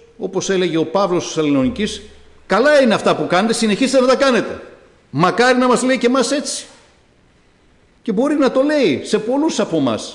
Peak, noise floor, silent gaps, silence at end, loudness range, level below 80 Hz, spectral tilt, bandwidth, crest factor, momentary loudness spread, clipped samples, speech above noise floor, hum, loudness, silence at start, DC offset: -4 dBFS; -53 dBFS; none; 0 s; 4 LU; -50 dBFS; -4.5 dB/octave; 11 kHz; 12 dB; 11 LU; under 0.1%; 37 dB; none; -16 LUFS; 0.2 s; under 0.1%